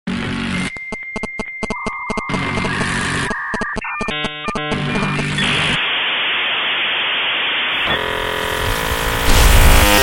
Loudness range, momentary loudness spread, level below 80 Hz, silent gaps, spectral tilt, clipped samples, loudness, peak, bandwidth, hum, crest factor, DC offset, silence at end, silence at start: 5 LU; 10 LU; -22 dBFS; none; -3.5 dB/octave; under 0.1%; -17 LUFS; 0 dBFS; 17 kHz; none; 18 dB; under 0.1%; 0 s; 0.05 s